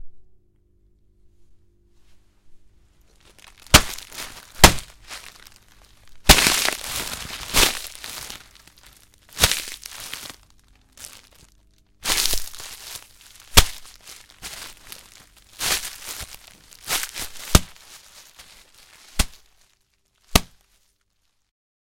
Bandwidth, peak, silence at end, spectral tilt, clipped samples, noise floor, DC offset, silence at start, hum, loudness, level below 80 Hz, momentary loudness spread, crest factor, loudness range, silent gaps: 17 kHz; 0 dBFS; 1.55 s; -2 dB/octave; under 0.1%; -69 dBFS; under 0.1%; 0 s; none; -20 LUFS; -34 dBFS; 26 LU; 26 dB; 10 LU; none